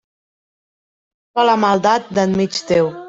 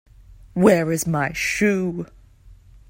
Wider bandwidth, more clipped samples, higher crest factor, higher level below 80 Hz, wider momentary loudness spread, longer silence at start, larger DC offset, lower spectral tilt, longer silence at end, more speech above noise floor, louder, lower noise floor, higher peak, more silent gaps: second, 7.8 kHz vs 16 kHz; neither; about the same, 16 dB vs 20 dB; second, -56 dBFS vs -48 dBFS; second, 4 LU vs 15 LU; first, 1.35 s vs 0.55 s; neither; about the same, -5 dB/octave vs -5.5 dB/octave; second, 0 s vs 0.35 s; first, over 74 dB vs 28 dB; first, -16 LUFS vs -20 LUFS; first, under -90 dBFS vs -48 dBFS; about the same, -2 dBFS vs -2 dBFS; neither